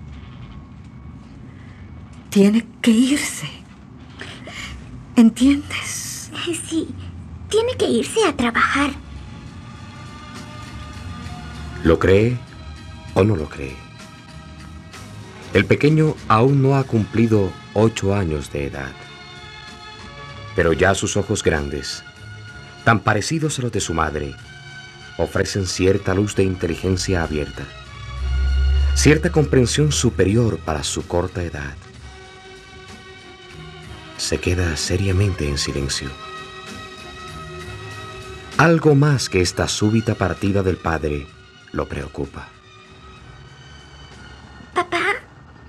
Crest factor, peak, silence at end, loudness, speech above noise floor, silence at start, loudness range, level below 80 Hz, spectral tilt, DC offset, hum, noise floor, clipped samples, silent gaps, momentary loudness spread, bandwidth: 20 dB; 0 dBFS; 0 s; -19 LUFS; 26 dB; 0 s; 9 LU; -34 dBFS; -5.5 dB/octave; under 0.1%; none; -44 dBFS; under 0.1%; none; 23 LU; 14.5 kHz